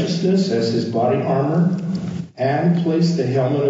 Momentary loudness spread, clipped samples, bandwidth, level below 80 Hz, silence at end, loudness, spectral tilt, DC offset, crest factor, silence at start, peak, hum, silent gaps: 6 LU; under 0.1%; 7.8 kHz; -60 dBFS; 0 s; -19 LUFS; -7.5 dB/octave; under 0.1%; 12 dB; 0 s; -6 dBFS; none; none